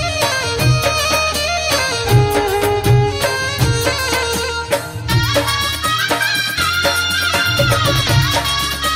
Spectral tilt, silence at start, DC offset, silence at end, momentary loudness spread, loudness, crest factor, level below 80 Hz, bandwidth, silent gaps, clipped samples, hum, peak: -3.5 dB/octave; 0 s; under 0.1%; 0 s; 3 LU; -15 LUFS; 14 dB; -32 dBFS; 16 kHz; none; under 0.1%; none; 0 dBFS